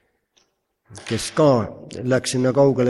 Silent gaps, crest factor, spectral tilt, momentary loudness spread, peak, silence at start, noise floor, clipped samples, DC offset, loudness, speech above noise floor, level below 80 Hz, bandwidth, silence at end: none; 16 dB; -5.5 dB/octave; 13 LU; -4 dBFS; 0.9 s; -67 dBFS; under 0.1%; under 0.1%; -20 LUFS; 48 dB; -54 dBFS; 12.5 kHz; 0 s